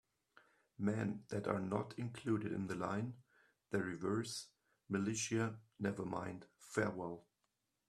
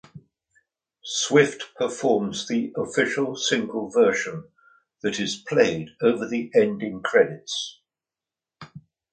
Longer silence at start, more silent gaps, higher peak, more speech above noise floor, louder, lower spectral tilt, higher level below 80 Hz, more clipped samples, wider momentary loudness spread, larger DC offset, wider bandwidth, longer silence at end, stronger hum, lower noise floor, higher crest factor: first, 0.8 s vs 0.15 s; neither; second, -20 dBFS vs -4 dBFS; second, 45 dB vs 67 dB; second, -42 LUFS vs -23 LUFS; first, -5.5 dB/octave vs -4 dB/octave; second, -76 dBFS vs -66 dBFS; neither; about the same, 9 LU vs 9 LU; neither; first, 13.5 kHz vs 9.4 kHz; first, 0.7 s vs 0.35 s; neither; second, -86 dBFS vs -90 dBFS; about the same, 22 dB vs 22 dB